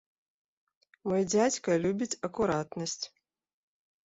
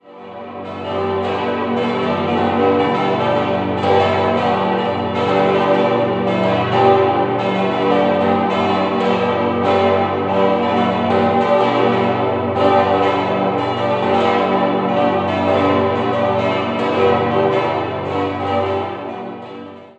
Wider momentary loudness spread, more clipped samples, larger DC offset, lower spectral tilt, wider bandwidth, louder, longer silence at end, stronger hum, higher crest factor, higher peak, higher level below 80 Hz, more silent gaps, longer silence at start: first, 11 LU vs 6 LU; neither; neither; second, -4.5 dB/octave vs -7 dB/octave; about the same, 8.2 kHz vs 8.4 kHz; second, -30 LUFS vs -16 LUFS; first, 1 s vs 0.1 s; neither; about the same, 18 dB vs 16 dB; second, -14 dBFS vs -2 dBFS; second, -64 dBFS vs -44 dBFS; neither; first, 1.05 s vs 0.05 s